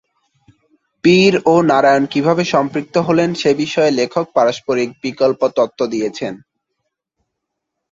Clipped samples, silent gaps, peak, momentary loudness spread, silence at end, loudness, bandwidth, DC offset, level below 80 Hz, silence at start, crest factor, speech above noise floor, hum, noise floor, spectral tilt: under 0.1%; none; -2 dBFS; 8 LU; 1.55 s; -15 LUFS; 7.8 kHz; under 0.1%; -58 dBFS; 1.05 s; 14 dB; 63 dB; none; -77 dBFS; -5.5 dB/octave